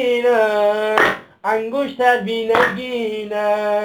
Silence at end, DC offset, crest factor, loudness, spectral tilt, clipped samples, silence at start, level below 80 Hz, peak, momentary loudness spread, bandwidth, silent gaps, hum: 0 s; under 0.1%; 18 dB; -18 LUFS; -4.5 dB/octave; under 0.1%; 0 s; -56 dBFS; 0 dBFS; 8 LU; 19.5 kHz; none; none